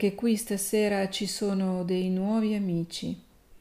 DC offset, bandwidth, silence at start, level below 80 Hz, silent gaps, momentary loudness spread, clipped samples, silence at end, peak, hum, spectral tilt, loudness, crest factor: under 0.1%; 15.5 kHz; 0 s; -60 dBFS; none; 8 LU; under 0.1%; 0.05 s; -14 dBFS; none; -5 dB/octave; -28 LUFS; 14 dB